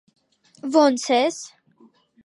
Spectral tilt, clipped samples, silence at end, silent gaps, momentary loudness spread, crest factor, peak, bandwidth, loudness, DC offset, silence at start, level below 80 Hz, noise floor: -2.5 dB/octave; under 0.1%; 0.8 s; none; 18 LU; 20 dB; -4 dBFS; 11.5 kHz; -20 LUFS; under 0.1%; 0.65 s; -82 dBFS; -56 dBFS